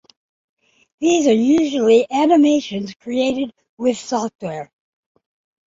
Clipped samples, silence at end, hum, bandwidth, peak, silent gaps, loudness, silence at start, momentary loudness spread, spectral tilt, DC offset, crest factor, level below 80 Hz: under 0.1%; 1.05 s; none; 7.8 kHz; -2 dBFS; 3.69-3.77 s, 4.35-4.39 s; -17 LUFS; 1 s; 15 LU; -4.5 dB/octave; under 0.1%; 16 dB; -60 dBFS